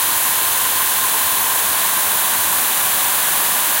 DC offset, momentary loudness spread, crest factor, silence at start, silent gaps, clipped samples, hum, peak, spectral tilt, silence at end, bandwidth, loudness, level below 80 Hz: under 0.1%; 0 LU; 14 dB; 0 s; none; under 0.1%; none; -2 dBFS; 1.5 dB/octave; 0 s; 16.5 kHz; -14 LUFS; -52 dBFS